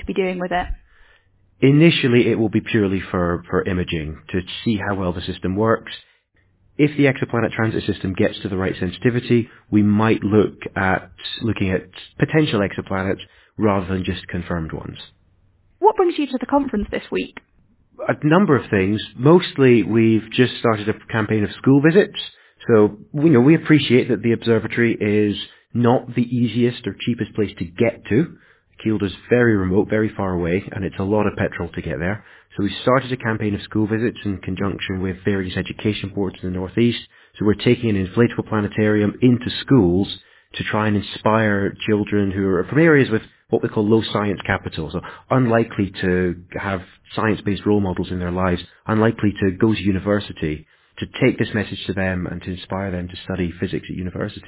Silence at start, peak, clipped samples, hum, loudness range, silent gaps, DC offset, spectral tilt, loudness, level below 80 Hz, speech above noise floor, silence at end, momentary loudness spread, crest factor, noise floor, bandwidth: 0 s; -2 dBFS; under 0.1%; none; 6 LU; none; under 0.1%; -11 dB/octave; -20 LUFS; -42 dBFS; 42 dB; 0.1 s; 12 LU; 18 dB; -61 dBFS; 4 kHz